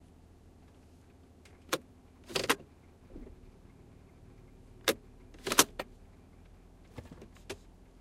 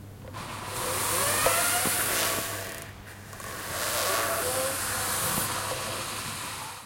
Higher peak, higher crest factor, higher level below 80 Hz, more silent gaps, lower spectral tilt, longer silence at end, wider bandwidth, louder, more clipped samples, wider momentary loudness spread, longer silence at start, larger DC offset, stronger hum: first, -4 dBFS vs -8 dBFS; first, 36 dB vs 22 dB; about the same, -58 dBFS vs -54 dBFS; neither; about the same, -1.5 dB/octave vs -1.5 dB/octave; first, 0.45 s vs 0 s; about the same, 16 kHz vs 16.5 kHz; second, -32 LUFS vs -27 LUFS; neither; first, 30 LU vs 16 LU; first, 1.7 s vs 0 s; neither; neither